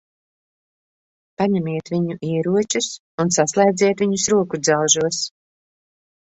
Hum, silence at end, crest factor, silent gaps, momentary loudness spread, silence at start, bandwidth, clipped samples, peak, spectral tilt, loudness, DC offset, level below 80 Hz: none; 1 s; 18 dB; 2.99-3.18 s; 8 LU; 1.4 s; 8.4 kHz; under 0.1%; -2 dBFS; -4 dB/octave; -19 LUFS; under 0.1%; -60 dBFS